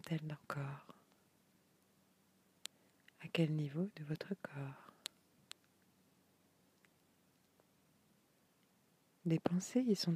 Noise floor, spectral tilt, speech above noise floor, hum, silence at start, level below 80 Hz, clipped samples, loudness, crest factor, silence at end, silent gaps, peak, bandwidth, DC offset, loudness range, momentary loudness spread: -74 dBFS; -6 dB/octave; 35 dB; none; 0.05 s; -84 dBFS; under 0.1%; -41 LUFS; 26 dB; 0 s; none; -18 dBFS; 15.5 kHz; under 0.1%; 15 LU; 19 LU